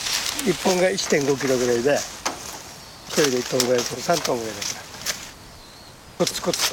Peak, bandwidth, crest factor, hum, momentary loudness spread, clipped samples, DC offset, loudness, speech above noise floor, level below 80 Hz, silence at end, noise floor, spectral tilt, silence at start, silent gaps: -2 dBFS; 17 kHz; 20 dB; none; 19 LU; under 0.1%; under 0.1%; -22 LUFS; 22 dB; -54 dBFS; 0 s; -44 dBFS; -3 dB/octave; 0 s; none